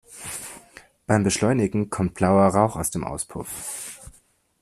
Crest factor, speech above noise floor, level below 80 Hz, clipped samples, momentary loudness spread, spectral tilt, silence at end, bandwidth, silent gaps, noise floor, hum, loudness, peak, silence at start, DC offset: 20 dB; 38 dB; -50 dBFS; under 0.1%; 19 LU; -5.5 dB/octave; 0.5 s; 14 kHz; none; -59 dBFS; none; -23 LUFS; -4 dBFS; 0.1 s; under 0.1%